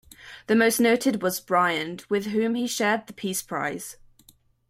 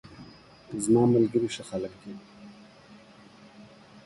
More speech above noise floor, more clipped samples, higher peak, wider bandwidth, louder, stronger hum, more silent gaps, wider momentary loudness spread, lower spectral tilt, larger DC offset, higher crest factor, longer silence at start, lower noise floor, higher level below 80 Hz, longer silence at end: first, 34 dB vs 27 dB; neither; first, -8 dBFS vs -12 dBFS; first, 16 kHz vs 11.5 kHz; about the same, -24 LUFS vs -26 LUFS; neither; neither; second, 11 LU vs 28 LU; second, -3.5 dB/octave vs -6.5 dB/octave; neither; about the same, 18 dB vs 18 dB; about the same, 0.2 s vs 0.1 s; first, -58 dBFS vs -52 dBFS; about the same, -64 dBFS vs -64 dBFS; first, 0.75 s vs 0.45 s